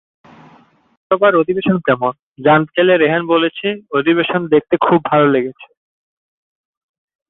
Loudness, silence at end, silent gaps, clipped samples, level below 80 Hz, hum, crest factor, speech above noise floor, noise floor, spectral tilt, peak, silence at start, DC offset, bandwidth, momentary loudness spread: -14 LUFS; 1.65 s; 2.23-2.35 s; under 0.1%; -58 dBFS; none; 14 dB; 35 dB; -49 dBFS; -10 dB/octave; -2 dBFS; 1.1 s; under 0.1%; 4.1 kHz; 6 LU